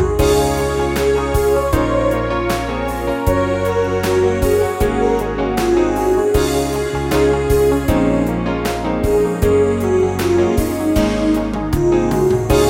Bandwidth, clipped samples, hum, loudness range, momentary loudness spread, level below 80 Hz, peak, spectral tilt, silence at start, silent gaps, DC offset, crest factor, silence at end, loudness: 16.5 kHz; under 0.1%; none; 1 LU; 5 LU; -26 dBFS; 0 dBFS; -6 dB/octave; 0 s; none; under 0.1%; 14 dB; 0 s; -16 LUFS